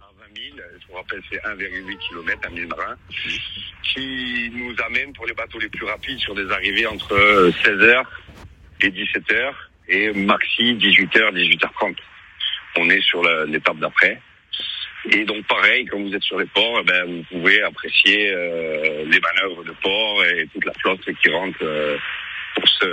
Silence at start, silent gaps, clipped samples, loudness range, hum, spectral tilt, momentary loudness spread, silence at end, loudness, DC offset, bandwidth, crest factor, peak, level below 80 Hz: 0.35 s; none; under 0.1%; 8 LU; none; -4 dB/octave; 14 LU; 0 s; -18 LUFS; under 0.1%; 15.5 kHz; 20 dB; 0 dBFS; -52 dBFS